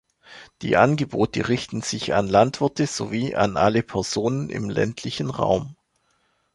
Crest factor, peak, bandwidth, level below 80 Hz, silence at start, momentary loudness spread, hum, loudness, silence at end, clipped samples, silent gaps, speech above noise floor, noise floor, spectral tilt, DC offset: 20 dB; -2 dBFS; 11.5 kHz; -50 dBFS; 0.3 s; 9 LU; none; -23 LUFS; 0.8 s; under 0.1%; none; 46 dB; -68 dBFS; -5.5 dB/octave; under 0.1%